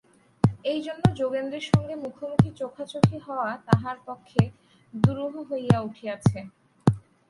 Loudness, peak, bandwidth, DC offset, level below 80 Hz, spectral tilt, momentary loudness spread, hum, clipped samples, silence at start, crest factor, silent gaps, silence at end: -26 LUFS; -4 dBFS; 11.5 kHz; under 0.1%; -50 dBFS; -7.5 dB/octave; 10 LU; none; under 0.1%; 0.45 s; 22 dB; none; 0.3 s